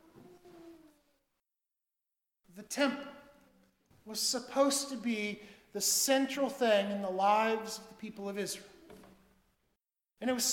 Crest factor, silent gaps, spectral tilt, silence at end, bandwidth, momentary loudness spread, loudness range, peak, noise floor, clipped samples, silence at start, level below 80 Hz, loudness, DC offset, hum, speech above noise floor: 20 dB; none; -2 dB/octave; 0 s; 18.5 kHz; 15 LU; 10 LU; -16 dBFS; -89 dBFS; under 0.1%; 0.15 s; -76 dBFS; -32 LUFS; under 0.1%; none; 57 dB